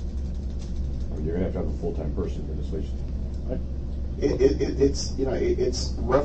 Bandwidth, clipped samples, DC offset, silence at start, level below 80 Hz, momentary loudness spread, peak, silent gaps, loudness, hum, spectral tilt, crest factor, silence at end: 8.4 kHz; under 0.1%; under 0.1%; 0 s; -30 dBFS; 10 LU; -6 dBFS; none; -28 LUFS; none; -6.5 dB/octave; 18 dB; 0 s